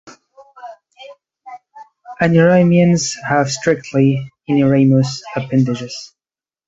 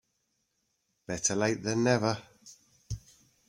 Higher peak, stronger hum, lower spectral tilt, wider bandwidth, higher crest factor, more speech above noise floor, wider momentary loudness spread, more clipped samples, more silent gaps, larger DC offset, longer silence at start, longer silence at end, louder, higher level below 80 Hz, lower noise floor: first, 0 dBFS vs -12 dBFS; neither; first, -6 dB/octave vs -4 dB/octave; second, 8 kHz vs 15.5 kHz; second, 16 dB vs 22 dB; first, over 76 dB vs 50 dB; about the same, 17 LU vs 16 LU; neither; neither; neither; second, 0.05 s vs 1.1 s; about the same, 0.6 s vs 0.5 s; first, -15 LUFS vs -29 LUFS; about the same, -54 dBFS vs -58 dBFS; first, under -90 dBFS vs -78 dBFS